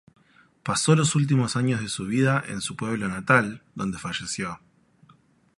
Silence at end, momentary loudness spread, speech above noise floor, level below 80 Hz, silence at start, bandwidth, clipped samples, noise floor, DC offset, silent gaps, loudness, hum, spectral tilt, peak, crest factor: 1 s; 12 LU; 35 dB; -58 dBFS; 0.65 s; 11.5 kHz; under 0.1%; -59 dBFS; under 0.1%; none; -24 LUFS; none; -5 dB/octave; -4 dBFS; 22 dB